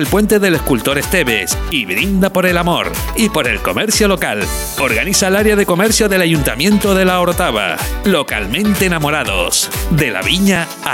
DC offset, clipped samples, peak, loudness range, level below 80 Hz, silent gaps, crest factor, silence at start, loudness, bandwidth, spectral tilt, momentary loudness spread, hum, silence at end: under 0.1%; under 0.1%; -2 dBFS; 2 LU; -28 dBFS; none; 12 dB; 0 s; -13 LUFS; 17 kHz; -4 dB/octave; 5 LU; none; 0 s